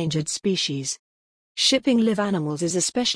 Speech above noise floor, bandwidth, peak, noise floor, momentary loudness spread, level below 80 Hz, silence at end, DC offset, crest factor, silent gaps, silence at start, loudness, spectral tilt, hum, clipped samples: over 67 dB; 10.5 kHz; -6 dBFS; under -90 dBFS; 10 LU; -62 dBFS; 0 s; under 0.1%; 16 dB; 0.99-1.55 s; 0 s; -22 LUFS; -3.5 dB/octave; none; under 0.1%